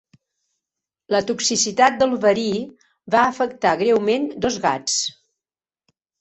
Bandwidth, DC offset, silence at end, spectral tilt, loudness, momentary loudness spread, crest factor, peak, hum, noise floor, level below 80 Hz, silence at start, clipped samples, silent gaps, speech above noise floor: 8.4 kHz; under 0.1%; 1.1 s; -2.5 dB/octave; -19 LUFS; 7 LU; 20 dB; -2 dBFS; none; under -90 dBFS; -58 dBFS; 1.1 s; under 0.1%; none; over 71 dB